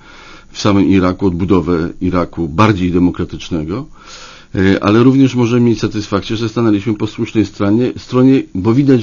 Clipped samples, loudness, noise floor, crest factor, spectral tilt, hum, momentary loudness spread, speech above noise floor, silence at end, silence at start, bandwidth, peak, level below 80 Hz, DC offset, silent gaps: under 0.1%; -14 LUFS; -37 dBFS; 14 dB; -7 dB/octave; none; 11 LU; 24 dB; 0 s; 0.15 s; 7.4 kHz; 0 dBFS; -36 dBFS; under 0.1%; none